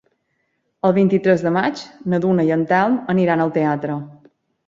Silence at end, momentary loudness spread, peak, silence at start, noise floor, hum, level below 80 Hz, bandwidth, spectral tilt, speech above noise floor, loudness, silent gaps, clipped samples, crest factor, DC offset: 0.55 s; 9 LU; -2 dBFS; 0.85 s; -70 dBFS; none; -60 dBFS; 7.6 kHz; -8 dB/octave; 52 dB; -18 LUFS; none; under 0.1%; 16 dB; under 0.1%